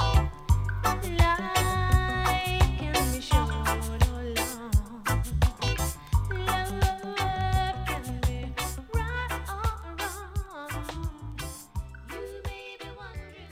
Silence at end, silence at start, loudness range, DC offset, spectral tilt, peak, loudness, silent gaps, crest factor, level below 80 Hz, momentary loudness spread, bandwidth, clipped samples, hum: 0 s; 0 s; 10 LU; under 0.1%; -4.5 dB/octave; -8 dBFS; -29 LUFS; none; 18 dB; -32 dBFS; 13 LU; 16 kHz; under 0.1%; none